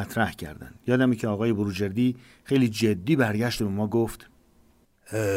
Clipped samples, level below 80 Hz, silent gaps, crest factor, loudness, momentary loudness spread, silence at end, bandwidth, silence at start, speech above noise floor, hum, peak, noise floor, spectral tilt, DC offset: under 0.1%; -54 dBFS; none; 16 dB; -25 LUFS; 13 LU; 0 s; 16 kHz; 0 s; 35 dB; none; -10 dBFS; -60 dBFS; -6.5 dB/octave; under 0.1%